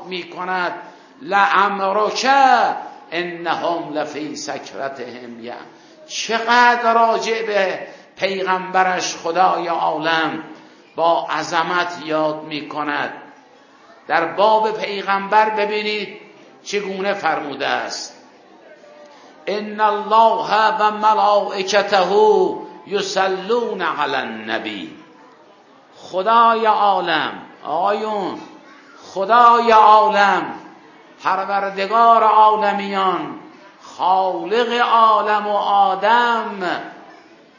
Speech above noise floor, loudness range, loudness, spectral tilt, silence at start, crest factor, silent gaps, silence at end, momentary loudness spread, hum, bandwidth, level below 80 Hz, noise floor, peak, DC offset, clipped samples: 31 dB; 8 LU; -17 LUFS; -3.5 dB/octave; 0 s; 18 dB; none; 0.55 s; 16 LU; none; 7.4 kHz; -72 dBFS; -48 dBFS; 0 dBFS; under 0.1%; under 0.1%